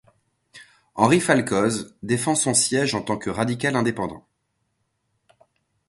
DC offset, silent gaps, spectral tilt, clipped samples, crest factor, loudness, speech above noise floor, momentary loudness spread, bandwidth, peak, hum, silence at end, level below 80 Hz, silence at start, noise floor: under 0.1%; none; -4 dB/octave; under 0.1%; 24 dB; -21 LUFS; 52 dB; 10 LU; 12 kHz; 0 dBFS; none; 1.7 s; -58 dBFS; 0.55 s; -74 dBFS